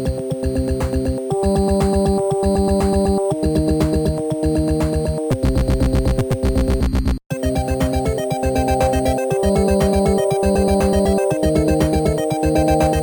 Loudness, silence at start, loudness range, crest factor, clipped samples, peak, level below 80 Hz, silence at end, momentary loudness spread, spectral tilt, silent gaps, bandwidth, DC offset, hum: -18 LUFS; 0 s; 3 LU; 14 dB; under 0.1%; -4 dBFS; -24 dBFS; 0 s; 5 LU; -6.5 dB/octave; 7.26-7.30 s; over 20 kHz; under 0.1%; none